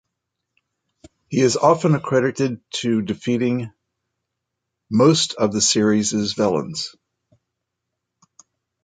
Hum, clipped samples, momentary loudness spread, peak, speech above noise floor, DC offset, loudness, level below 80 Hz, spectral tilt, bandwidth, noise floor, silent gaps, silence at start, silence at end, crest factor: none; under 0.1%; 10 LU; -2 dBFS; 61 dB; under 0.1%; -19 LUFS; -58 dBFS; -4.5 dB/octave; 9.6 kHz; -80 dBFS; none; 1.3 s; 1.95 s; 20 dB